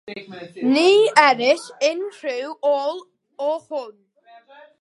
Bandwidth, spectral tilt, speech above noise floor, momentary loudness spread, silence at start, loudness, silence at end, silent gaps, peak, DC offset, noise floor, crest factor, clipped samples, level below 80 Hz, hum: 11.5 kHz; -3 dB/octave; 30 dB; 21 LU; 0.05 s; -19 LUFS; 0.9 s; none; 0 dBFS; under 0.1%; -49 dBFS; 20 dB; under 0.1%; -70 dBFS; none